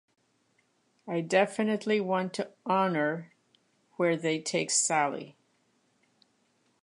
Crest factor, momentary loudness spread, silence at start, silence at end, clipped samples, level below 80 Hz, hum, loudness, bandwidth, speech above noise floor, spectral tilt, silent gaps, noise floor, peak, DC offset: 22 dB; 10 LU; 1.05 s; 1.5 s; under 0.1%; -84 dBFS; none; -29 LUFS; 11.5 kHz; 43 dB; -3.5 dB/octave; none; -71 dBFS; -10 dBFS; under 0.1%